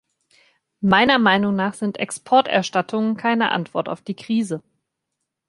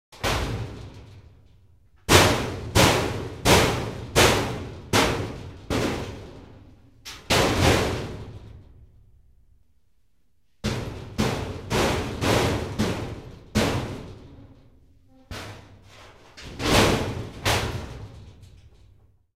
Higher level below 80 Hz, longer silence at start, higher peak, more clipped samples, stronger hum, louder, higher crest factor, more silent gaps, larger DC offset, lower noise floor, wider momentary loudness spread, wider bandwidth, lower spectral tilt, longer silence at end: second, -60 dBFS vs -38 dBFS; first, 0.8 s vs 0.1 s; about the same, -2 dBFS vs -2 dBFS; neither; neither; first, -20 LUFS vs -23 LUFS; about the same, 20 dB vs 24 dB; neither; second, under 0.1% vs 0.1%; first, -79 dBFS vs -69 dBFS; second, 13 LU vs 22 LU; second, 11.5 kHz vs 16 kHz; about the same, -5 dB/octave vs -4 dB/octave; about the same, 0.9 s vs 0.9 s